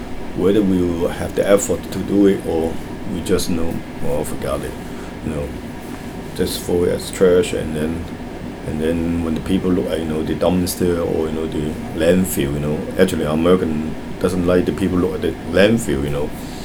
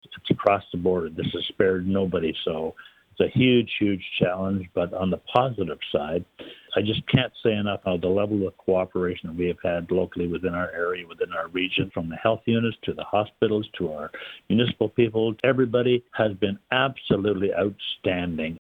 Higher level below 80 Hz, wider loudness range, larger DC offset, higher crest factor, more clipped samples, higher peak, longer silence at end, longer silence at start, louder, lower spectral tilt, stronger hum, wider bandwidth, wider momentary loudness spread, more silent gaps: first, -36 dBFS vs -54 dBFS; first, 6 LU vs 3 LU; neither; about the same, 18 dB vs 20 dB; neither; first, 0 dBFS vs -4 dBFS; about the same, 0 s vs 0.05 s; about the same, 0 s vs 0.1 s; first, -19 LUFS vs -25 LUFS; second, -6 dB/octave vs -8.5 dB/octave; neither; first, over 20 kHz vs 5 kHz; first, 12 LU vs 7 LU; neither